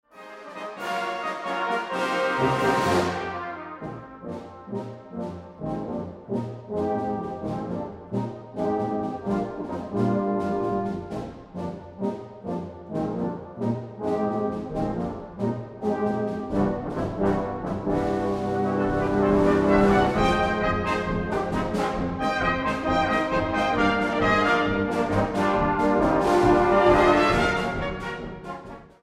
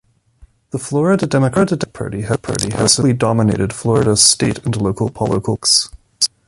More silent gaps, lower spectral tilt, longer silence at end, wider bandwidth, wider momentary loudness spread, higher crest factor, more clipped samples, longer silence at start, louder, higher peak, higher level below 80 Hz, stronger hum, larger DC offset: neither; first, -6.5 dB/octave vs -4 dB/octave; about the same, 0.15 s vs 0.2 s; about the same, 14 kHz vs 14.5 kHz; first, 15 LU vs 10 LU; about the same, 18 dB vs 16 dB; neither; second, 0.15 s vs 0.4 s; second, -25 LUFS vs -15 LUFS; second, -6 dBFS vs 0 dBFS; about the same, -42 dBFS vs -42 dBFS; neither; neither